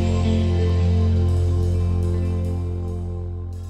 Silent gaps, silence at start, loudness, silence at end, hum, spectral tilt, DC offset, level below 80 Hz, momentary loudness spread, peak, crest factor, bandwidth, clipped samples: none; 0 s; -22 LUFS; 0 s; none; -8.5 dB/octave; under 0.1%; -30 dBFS; 9 LU; -10 dBFS; 10 dB; 8.4 kHz; under 0.1%